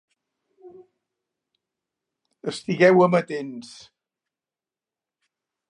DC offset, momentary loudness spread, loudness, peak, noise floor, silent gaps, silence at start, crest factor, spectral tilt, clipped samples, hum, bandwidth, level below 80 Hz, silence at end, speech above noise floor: under 0.1%; 20 LU; -20 LUFS; -4 dBFS; under -90 dBFS; none; 0.65 s; 22 dB; -6.5 dB/octave; under 0.1%; none; 10.5 kHz; -76 dBFS; 2.05 s; over 69 dB